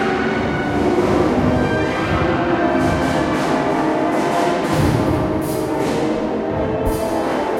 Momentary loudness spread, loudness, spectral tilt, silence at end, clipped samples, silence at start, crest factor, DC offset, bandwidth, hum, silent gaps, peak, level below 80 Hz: 4 LU; -18 LUFS; -6.5 dB/octave; 0 s; under 0.1%; 0 s; 14 dB; under 0.1%; 16.5 kHz; none; none; -2 dBFS; -36 dBFS